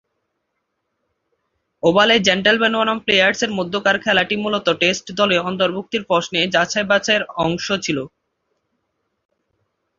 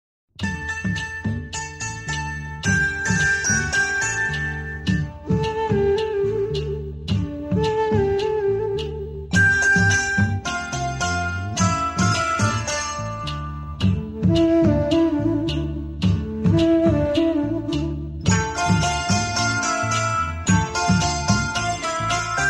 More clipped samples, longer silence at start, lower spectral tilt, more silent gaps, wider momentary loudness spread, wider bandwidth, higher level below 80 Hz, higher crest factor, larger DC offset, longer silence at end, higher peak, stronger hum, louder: neither; first, 1.85 s vs 0.4 s; about the same, -3.5 dB/octave vs -4.5 dB/octave; neither; second, 7 LU vs 10 LU; second, 7.6 kHz vs 12 kHz; second, -56 dBFS vs -36 dBFS; about the same, 18 dB vs 16 dB; neither; first, 1.9 s vs 0 s; about the same, -2 dBFS vs -4 dBFS; neither; first, -17 LUFS vs -21 LUFS